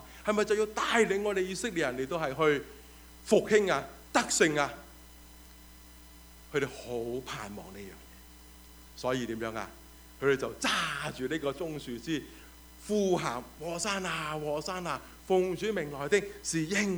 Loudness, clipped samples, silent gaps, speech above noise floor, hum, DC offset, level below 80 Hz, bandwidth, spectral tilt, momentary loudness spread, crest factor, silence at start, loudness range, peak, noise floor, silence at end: -31 LUFS; under 0.1%; none; 22 dB; none; under 0.1%; -56 dBFS; over 20 kHz; -3.5 dB/octave; 22 LU; 22 dB; 0 s; 10 LU; -10 dBFS; -52 dBFS; 0 s